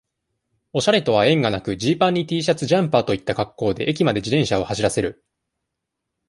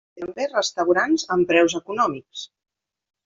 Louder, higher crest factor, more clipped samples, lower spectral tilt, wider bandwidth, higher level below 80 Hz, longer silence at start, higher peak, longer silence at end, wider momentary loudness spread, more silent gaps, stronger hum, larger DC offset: about the same, -20 LUFS vs -21 LUFS; about the same, 18 dB vs 18 dB; neither; first, -5.5 dB/octave vs -3.5 dB/octave; first, 11.5 kHz vs 7.6 kHz; first, -50 dBFS vs -64 dBFS; first, 0.75 s vs 0.15 s; about the same, -2 dBFS vs -4 dBFS; first, 1.15 s vs 0.8 s; second, 6 LU vs 17 LU; neither; neither; neither